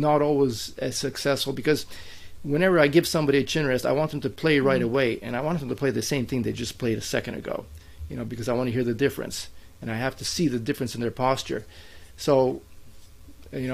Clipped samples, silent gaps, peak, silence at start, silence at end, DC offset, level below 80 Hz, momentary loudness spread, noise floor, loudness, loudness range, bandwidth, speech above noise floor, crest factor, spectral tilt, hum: under 0.1%; none; -4 dBFS; 0 s; 0 s; under 0.1%; -50 dBFS; 14 LU; -45 dBFS; -25 LUFS; 6 LU; 15.5 kHz; 20 dB; 20 dB; -5 dB/octave; none